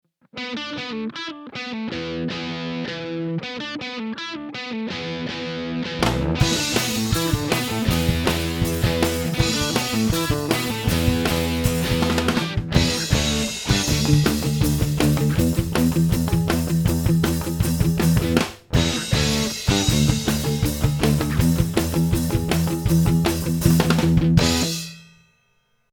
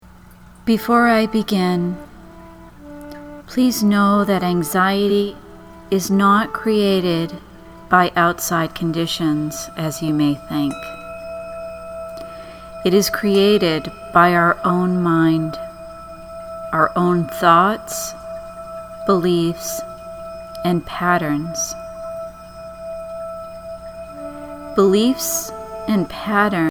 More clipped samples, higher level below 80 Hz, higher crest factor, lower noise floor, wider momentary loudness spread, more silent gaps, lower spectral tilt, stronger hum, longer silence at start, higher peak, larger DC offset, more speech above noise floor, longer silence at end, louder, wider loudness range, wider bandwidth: neither; first, -32 dBFS vs -46 dBFS; about the same, 20 dB vs 18 dB; first, -65 dBFS vs -43 dBFS; second, 10 LU vs 19 LU; neither; about the same, -5 dB/octave vs -5 dB/octave; second, none vs 60 Hz at -45 dBFS; first, 0.35 s vs 0.15 s; about the same, 0 dBFS vs 0 dBFS; neither; first, 36 dB vs 26 dB; first, 0.9 s vs 0 s; second, -21 LUFS vs -18 LUFS; about the same, 8 LU vs 7 LU; about the same, over 20 kHz vs over 20 kHz